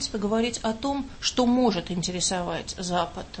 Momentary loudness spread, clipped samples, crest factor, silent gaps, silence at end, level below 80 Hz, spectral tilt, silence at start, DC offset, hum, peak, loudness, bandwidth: 8 LU; under 0.1%; 18 dB; none; 0 s; -46 dBFS; -4 dB/octave; 0 s; under 0.1%; none; -8 dBFS; -26 LUFS; 8.8 kHz